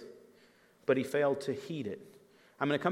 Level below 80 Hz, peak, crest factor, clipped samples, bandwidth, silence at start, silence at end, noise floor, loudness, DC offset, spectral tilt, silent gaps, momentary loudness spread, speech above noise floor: -84 dBFS; -14 dBFS; 22 dB; under 0.1%; 16 kHz; 0 s; 0 s; -64 dBFS; -34 LUFS; under 0.1%; -6 dB/octave; none; 13 LU; 32 dB